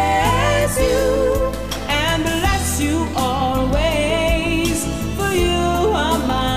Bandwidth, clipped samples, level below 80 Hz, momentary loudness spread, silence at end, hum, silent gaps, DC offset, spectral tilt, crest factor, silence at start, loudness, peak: 16 kHz; under 0.1%; -26 dBFS; 4 LU; 0 s; none; none; 1%; -4.5 dB/octave; 12 dB; 0 s; -18 LUFS; -6 dBFS